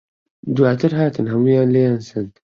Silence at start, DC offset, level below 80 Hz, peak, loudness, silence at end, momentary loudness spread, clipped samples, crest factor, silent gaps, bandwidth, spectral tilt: 0.45 s; under 0.1%; -56 dBFS; -2 dBFS; -17 LUFS; 0.25 s; 13 LU; under 0.1%; 16 dB; none; 7.2 kHz; -9 dB/octave